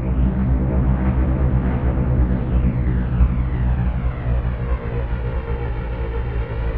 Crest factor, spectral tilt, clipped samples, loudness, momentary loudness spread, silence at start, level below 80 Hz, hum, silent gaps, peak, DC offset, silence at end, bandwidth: 16 dB; -12 dB/octave; under 0.1%; -21 LUFS; 6 LU; 0 s; -20 dBFS; none; none; -4 dBFS; under 0.1%; 0 s; 3.7 kHz